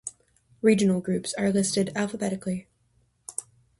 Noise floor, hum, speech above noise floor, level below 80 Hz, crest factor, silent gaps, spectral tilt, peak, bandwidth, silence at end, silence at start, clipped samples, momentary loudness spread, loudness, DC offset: -67 dBFS; none; 43 dB; -62 dBFS; 20 dB; none; -5 dB/octave; -8 dBFS; 11.5 kHz; 0.4 s; 0.05 s; under 0.1%; 14 LU; -26 LUFS; under 0.1%